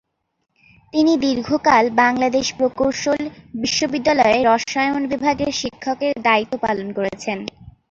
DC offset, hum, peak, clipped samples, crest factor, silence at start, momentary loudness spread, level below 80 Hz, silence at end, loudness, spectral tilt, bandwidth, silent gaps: under 0.1%; none; -2 dBFS; under 0.1%; 18 dB; 0.95 s; 10 LU; -52 dBFS; 0.2 s; -19 LUFS; -3.5 dB/octave; 7.8 kHz; none